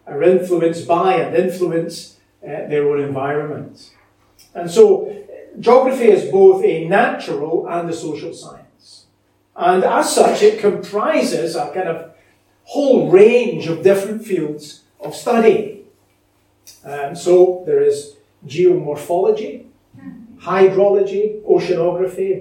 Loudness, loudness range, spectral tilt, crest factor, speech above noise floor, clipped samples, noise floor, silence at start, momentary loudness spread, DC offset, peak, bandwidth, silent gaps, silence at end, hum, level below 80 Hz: -15 LUFS; 6 LU; -5.5 dB/octave; 16 dB; 44 dB; under 0.1%; -60 dBFS; 0.05 s; 17 LU; under 0.1%; 0 dBFS; 16.5 kHz; none; 0 s; none; -64 dBFS